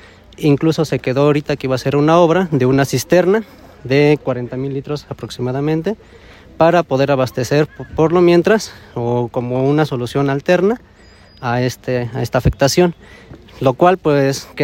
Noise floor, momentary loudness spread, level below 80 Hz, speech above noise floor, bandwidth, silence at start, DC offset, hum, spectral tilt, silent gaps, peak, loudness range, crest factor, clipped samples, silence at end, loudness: -44 dBFS; 11 LU; -40 dBFS; 29 dB; 16.5 kHz; 0.4 s; under 0.1%; none; -6.5 dB/octave; none; 0 dBFS; 4 LU; 16 dB; under 0.1%; 0 s; -16 LUFS